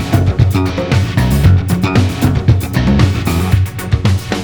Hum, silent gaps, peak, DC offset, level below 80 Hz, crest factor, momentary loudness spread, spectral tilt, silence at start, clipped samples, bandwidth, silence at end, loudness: none; none; 0 dBFS; under 0.1%; -22 dBFS; 12 dB; 4 LU; -6.5 dB/octave; 0 s; under 0.1%; over 20 kHz; 0 s; -13 LUFS